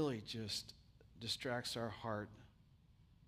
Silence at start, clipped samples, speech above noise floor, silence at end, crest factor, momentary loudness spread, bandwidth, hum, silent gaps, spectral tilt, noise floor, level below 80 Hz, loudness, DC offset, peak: 0 s; under 0.1%; 23 dB; 0.15 s; 18 dB; 13 LU; 15.5 kHz; none; none; -4 dB/octave; -68 dBFS; -70 dBFS; -44 LUFS; under 0.1%; -28 dBFS